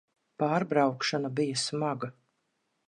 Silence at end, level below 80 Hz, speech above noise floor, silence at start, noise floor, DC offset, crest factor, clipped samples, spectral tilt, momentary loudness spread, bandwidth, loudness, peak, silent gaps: 0.75 s; -80 dBFS; 49 dB; 0.4 s; -78 dBFS; under 0.1%; 20 dB; under 0.1%; -4.5 dB/octave; 7 LU; 11 kHz; -29 LUFS; -12 dBFS; none